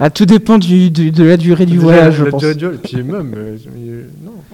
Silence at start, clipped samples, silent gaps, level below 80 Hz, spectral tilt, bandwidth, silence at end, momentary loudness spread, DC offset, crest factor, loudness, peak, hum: 0 s; 2%; none; -44 dBFS; -8 dB/octave; 12 kHz; 0.15 s; 20 LU; 0.4%; 10 dB; -10 LUFS; 0 dBFS; none